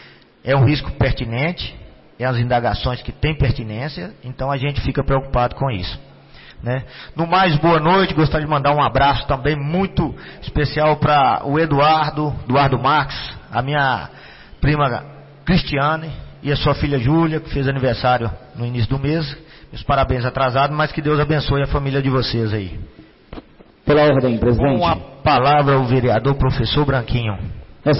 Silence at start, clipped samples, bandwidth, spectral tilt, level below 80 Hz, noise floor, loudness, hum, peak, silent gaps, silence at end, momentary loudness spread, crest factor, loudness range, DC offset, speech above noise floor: 0 s; under 0.1%; 5.8 kHz; -10.5 dB/octave; -32 dBFS; -42 dBFS; -18 LUFS; none; -6 dBFS; none; 0 s; 13 LU; 12 dB; 5 LU; under 0.1%; 25 dB